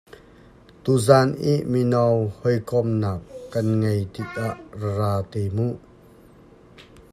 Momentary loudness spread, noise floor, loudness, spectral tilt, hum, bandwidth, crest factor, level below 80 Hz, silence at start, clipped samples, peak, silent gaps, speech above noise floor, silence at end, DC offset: 13 LU; -49 dBFS; -23 LUFS; -7 dB/octave; none; 13.5 kHz; 22 dB; -56 dBFS; 0.85 s; under 0.1%; 0 dBFS; none; 28 dB; 0.3 s; under 0.1%